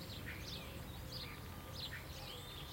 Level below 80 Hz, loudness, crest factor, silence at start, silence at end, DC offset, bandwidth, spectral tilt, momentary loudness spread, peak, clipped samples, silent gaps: -58 dBFS; -48 LUFS; 14 dB; 0 s; 0 s; under 0.1%; 16.5 kHz; -4 dB/octave; 3 LU; -34 dBFS; under 0.1%; none